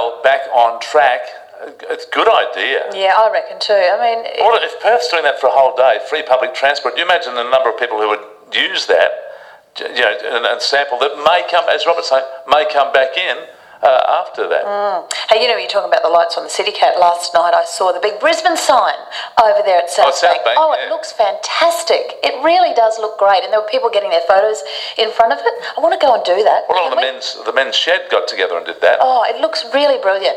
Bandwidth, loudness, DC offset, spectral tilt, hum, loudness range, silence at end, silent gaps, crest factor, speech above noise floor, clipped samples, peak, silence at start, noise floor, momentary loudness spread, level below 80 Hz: 13 kHz; -14 LUFS; under 0.1%; -0.5 dB/octave; none; 2 LU; 0 s; none; 14 dB; 22 dB; under 0.1%; 0 dBFS; 0 s; -36 dBFS; 6 LU; -62 dBFS